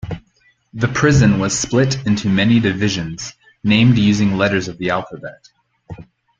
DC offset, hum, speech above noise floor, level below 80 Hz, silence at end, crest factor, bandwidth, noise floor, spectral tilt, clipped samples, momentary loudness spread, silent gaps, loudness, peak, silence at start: under 0.1%; none; 42 dB; -42 dBFS; 0.4 s; 16 dB; 9.4 kHz; -58 dBFS; -5.5 dB/octave; under 0.1%; 20 LU; none; -16 LUFS; -2 dBFS; 0.05 s